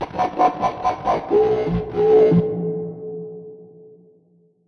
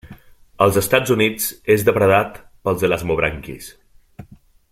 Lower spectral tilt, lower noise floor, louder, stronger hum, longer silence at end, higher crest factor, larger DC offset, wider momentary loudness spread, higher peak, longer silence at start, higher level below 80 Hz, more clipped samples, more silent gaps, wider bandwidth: first, -8.5 dB/octave vs -4.5 dB/octave; first, -58 dBFS vs -47 dBFS; about the same, -19 LUFS vs -18 LUFS; neither; first, 0.85 s vs 0.5 s; about the same, 16 dB vs 18 dB; neither; about the same, 18 LU vs 16 LU; about the same, -4 dBFS vs -2 dBFS; about the same, 0 s vs 0.05 s; about the same, -46 dBFS vs -44 dBFS; neither; neither; second, 6.4 kHz vs 16.5 kHz